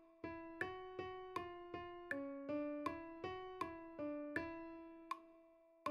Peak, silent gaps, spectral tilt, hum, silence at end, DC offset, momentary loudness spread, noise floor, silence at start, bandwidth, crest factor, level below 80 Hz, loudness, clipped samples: -28 dBFS; none; -6 dB/octave; none; 0 s; under 0.1%; 7 LU; -68 dBFS; 0 s; 12.5 kHz; 20 dB; -74 dBFS; -48 LUFS; under 0.1%